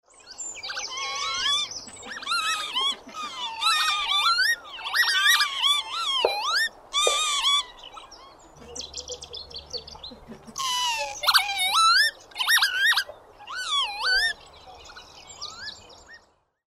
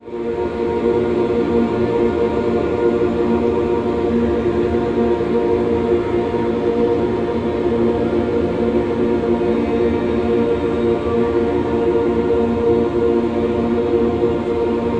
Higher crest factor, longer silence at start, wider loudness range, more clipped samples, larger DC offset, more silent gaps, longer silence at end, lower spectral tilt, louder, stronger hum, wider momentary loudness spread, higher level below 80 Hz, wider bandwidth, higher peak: first, 22 dB vs 12 dB; first, 0.25 s vs 0 s; first, 7 LU vs 1 LU; neither; second, under 0.1% vs 0.4%; neither; first, 0.55 s vs 0 s; second, 1.5 dB/octave vs -8.5 dB/octave; second, -22 LUFS vs -18 LUFS; neither; first, 19 LU vs 2 LU; second, -58 dBFS vs -36 dBFS; first, 16 kHz vs 8 kHz; about the same, -6 dBFS vs -4 dBFS